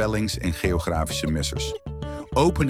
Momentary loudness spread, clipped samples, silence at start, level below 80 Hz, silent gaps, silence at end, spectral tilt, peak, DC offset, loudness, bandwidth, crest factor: 11 LU; under 0.1%; 0 s; -34 dBFS; none; 0 s; -5 dB/octave; -8 dBFS; under 0.1%; -26 LUFS; 16 kHz; 16 dB